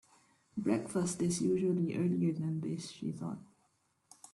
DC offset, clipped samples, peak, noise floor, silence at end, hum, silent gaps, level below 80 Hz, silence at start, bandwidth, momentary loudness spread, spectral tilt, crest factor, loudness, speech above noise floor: under 0.1%; under 0.1%; -18 dBFS; -75 dBFS; 0.9 s; none; none; -72 dBFS; 0.55 s; 12 kHz; 11 LU; -6.5 dB/octave; 18 dB; -35 LUFS; 42 dB